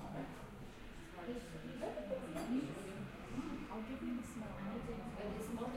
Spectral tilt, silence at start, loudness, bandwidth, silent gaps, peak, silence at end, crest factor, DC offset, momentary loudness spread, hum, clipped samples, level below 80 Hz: -6 dB/octave; 0 s; -46 LUFS; 16 kHz; none; -30 dBFS; 0 s; 16 dB; under 0.1%; 10 LU; none; under 0.1%; -58 dBFS